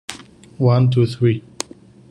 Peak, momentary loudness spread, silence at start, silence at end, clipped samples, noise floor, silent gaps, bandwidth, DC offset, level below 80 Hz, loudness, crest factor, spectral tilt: -2 dBFS; 17 LU; 0.1 s; 0.7 s; under 0.1%; -40 dBFS; none; 11 kHz; under 0.1%; -54 dBFS; -17 LUFS; 18 dB; -7 dB/octave